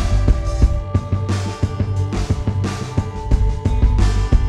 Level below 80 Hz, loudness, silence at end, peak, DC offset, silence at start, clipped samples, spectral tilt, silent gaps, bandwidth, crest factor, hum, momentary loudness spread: -18 dBFS; -20 LUFS; 0 s; -2 dBFS; under 0.1%; 0 s; under 0.1%; -7 dB/octave; none; 10.5 kHz; 16 dB; none; 5 LU